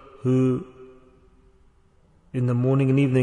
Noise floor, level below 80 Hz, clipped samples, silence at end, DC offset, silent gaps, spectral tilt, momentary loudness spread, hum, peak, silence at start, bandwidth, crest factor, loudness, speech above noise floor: -58 dBFS; -58 dBFS; under 0.1%; 0 s; under 0.1%; none; -9.5 dB/octave; 12 LU; none; -8 dBFS; 0.25 s; 9.2 kHz; 16 dB; -23 LUFS; 38 dB